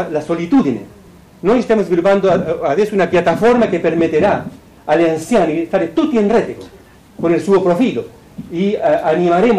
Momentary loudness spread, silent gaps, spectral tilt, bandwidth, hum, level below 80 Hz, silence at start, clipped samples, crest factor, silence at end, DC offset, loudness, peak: 11 LU; none; -7 dB/octave; 13.5 kHz; none; -46 dBFS; 0 s; under 0.1%; 10 dB; 0 s; under 0.1%; -15 LUFS; -6 dBFS